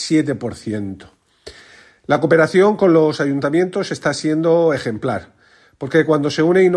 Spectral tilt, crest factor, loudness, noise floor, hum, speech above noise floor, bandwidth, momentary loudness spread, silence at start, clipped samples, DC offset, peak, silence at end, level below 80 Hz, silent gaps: -6 dB/octave; 16 dB; -17 LUFS; -46 dBFS; none; 30 dB; 12 kHz; 13 LU; 0 s; under 0.1%; under 0.1%; -2 dBFS; 0 s; -58 dBFS; none